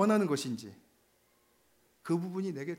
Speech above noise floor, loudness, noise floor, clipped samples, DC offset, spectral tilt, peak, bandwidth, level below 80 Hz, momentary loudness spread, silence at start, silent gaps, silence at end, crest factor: 38 dB; -33 LUFS; -70 dBFS; under 0.1%; under 0.1%; -6 dB/octave; -14 dBFS; 16 kHz; -84 dBFS; 18 LU; 0 s; none; 0 s; 20 dB